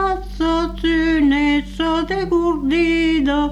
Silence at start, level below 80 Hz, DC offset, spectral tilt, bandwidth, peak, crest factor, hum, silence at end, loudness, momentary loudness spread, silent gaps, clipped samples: 0 s; -32 dBFS; under 0.1%; -5.5 dB/octave; 10.5 kHz; -8 dBFS; 10 dB; none; 0 s; -18 LUFS; 5 LU; none; under 0.1%